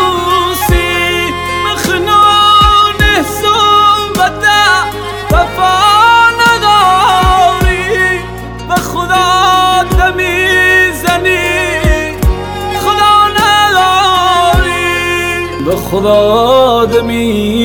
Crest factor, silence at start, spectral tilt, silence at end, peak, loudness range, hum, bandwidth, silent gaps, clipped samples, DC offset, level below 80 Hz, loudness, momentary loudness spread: 10 dB; 0 s; -3.5 dB/octave; 0 s; 0 dBFS; 2 LU; none; 20 kHz; none; under 0.1%; under 0.1%; -22 dBFS; -9 LUFS; 8 LU